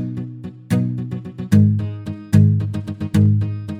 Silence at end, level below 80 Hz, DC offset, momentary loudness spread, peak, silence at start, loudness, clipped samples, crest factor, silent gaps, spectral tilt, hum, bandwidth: 0 s; -48 dBFS; under 0.1%; 15 LU; -2 dBFS; 0 s; -18 LUFS; under 0.1%; 16 dB; none; -8.5 dB/octave; none; 12 kHz